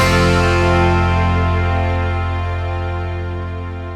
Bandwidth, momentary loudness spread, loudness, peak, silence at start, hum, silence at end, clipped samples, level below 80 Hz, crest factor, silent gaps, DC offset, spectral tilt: 12.5 kHz; 11 LU; -17 LUFS; -2 dBFS; 0 s; none; 0 s; under 0.1%; -26 dBFS; 14 dB; none; under 0.1%; -6.5 dB/octave